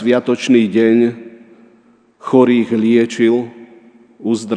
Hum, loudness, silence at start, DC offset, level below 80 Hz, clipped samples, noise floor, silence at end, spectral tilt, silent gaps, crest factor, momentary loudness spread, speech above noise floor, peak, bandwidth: none; -14 LUFS; 0 s; under 0.1%; -68 dBFS; under 0.1%; -51 dBFS; 0 s; -6 dB/octave; none; 14 dB; 14 LU; 38 dB; 0 dBFS; 9.8 kHz